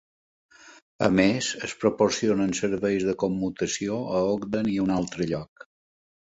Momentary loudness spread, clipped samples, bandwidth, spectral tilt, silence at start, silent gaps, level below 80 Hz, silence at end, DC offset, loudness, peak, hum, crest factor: 7 LU; under 0.1%; 8 kHz; -5 dB/octave; 0.65 s; 0.82-0.99 s; -54 dBFS; 0.85 s; under 0.1%; -25 LUFS; -6 dBFS; none; 20 dB